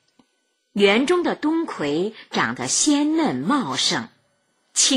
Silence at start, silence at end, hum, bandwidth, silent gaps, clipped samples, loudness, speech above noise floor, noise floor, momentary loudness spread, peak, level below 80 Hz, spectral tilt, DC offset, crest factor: 0.75 s; 0 s; none; 14.5 kHz; none; under 0.1%; -21 LUFS; 49 dB; -70 dBFS; 8 LU; -4 dBFS; -62 dBFS; -2.5 dB/octave; under 0.1%; 16 dB